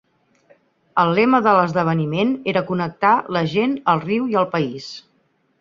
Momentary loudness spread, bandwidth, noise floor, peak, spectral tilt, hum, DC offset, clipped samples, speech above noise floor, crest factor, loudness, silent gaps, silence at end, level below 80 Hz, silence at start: 9 LU; 7.4 kHz; -64 dBFS; -2 dBFS; -7.5 dB/octave; none; under 0.1%; under 0.1%; 45 dB; 18 dB; -19 LUFS; none; 0.6 s; -60 dBFS; 0.95 s